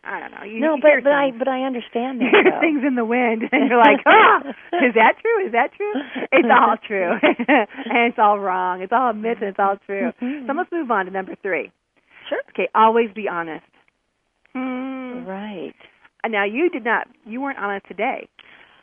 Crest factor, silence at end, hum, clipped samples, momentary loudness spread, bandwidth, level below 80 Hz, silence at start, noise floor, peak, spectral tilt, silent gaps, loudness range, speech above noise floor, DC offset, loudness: 20 dB; 0.6 s; none; under 0.1%; 15 LU; 3.7 kHz; -70 dBFS; 0.05 s; -71 dBFS; 0 dBFS; -7.5 dB/octave; none; 9 LU; 52 dB; under 0.1%; -18 LUFS